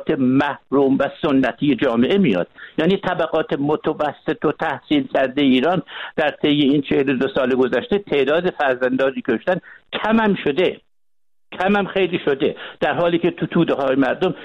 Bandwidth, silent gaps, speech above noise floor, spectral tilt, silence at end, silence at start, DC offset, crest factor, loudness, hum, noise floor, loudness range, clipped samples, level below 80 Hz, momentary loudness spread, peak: 6.8 kHz; none; 60 dB; -8 dB/octave; 0 s; 0 s; under 0.1%; 14 dB; -19 LUFS; none; -79 dBFS; 2 LU; under 0.1%; -52 dBFS; 6 LU; -6 dBFS